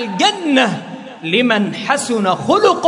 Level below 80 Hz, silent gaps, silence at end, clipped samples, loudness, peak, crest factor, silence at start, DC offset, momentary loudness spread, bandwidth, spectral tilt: -64 dBFS; none; 0 s; under 0.1%; -15 LUFS; 0 dBFS; 16 dB; 0 s; under 0.1%; 10 LU; 11 kHz; -4 dB/octave